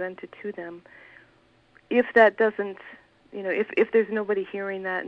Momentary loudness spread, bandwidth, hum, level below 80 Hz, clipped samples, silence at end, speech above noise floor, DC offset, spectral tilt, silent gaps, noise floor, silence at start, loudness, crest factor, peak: 21 LU; 5.6 kHz; none; -70 dBFS; under 0.1%; 0 s; 35 dB; under 0.1%; -7 dB/octave; none; -60 dBFS; 0 s; -24 LUFS; 22 dB; -4 dBFS